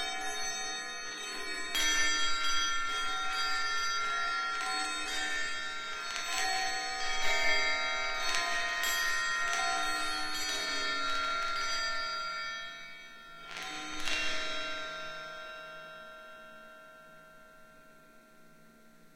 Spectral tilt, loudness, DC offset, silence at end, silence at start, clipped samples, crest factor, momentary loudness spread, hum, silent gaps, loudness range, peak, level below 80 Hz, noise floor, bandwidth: 0.5 dB/octave; -32 LUFS; under 0.1%; 0.1 s; 0 s; under 0.1%; 24 dB; 16 LU; none; none; 11 LU; -10 dBFS; -52 dBFS; -58 dBFS; 16.5 kHz